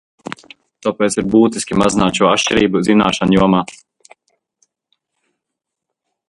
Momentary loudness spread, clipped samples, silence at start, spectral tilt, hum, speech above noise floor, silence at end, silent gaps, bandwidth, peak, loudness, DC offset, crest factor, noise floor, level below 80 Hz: 18 LU; under 0.1%; 0.85 s; -5 dB/octave; none; 66 dB; 2.55 s; none; 11.5 kHz; 0 dBFS; -14 LUFS; under 0.1%; 16 dB; -80 dBFS; -44 dBFS